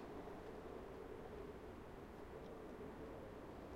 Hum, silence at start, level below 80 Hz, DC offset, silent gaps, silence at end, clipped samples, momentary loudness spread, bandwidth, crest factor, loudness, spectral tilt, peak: none; 0 s; -64 dBFS; under 0.1%; none; 0 s; under 0.1%; 2 LU; 16 kHz; 12 dB; -54 LUFS; -7 dB/octave; -42 dBFS